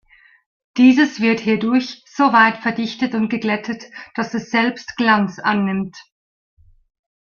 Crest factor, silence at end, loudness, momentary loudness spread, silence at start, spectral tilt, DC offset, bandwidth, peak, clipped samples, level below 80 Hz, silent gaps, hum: 18 dB; 1.25 s; -17 LUFS; 15 LU; 0.75 s; -5.5 dB/octave; under 0.1%; 7 kHz; 0 dBFS; under 0.1%; -60 dBFS; none; none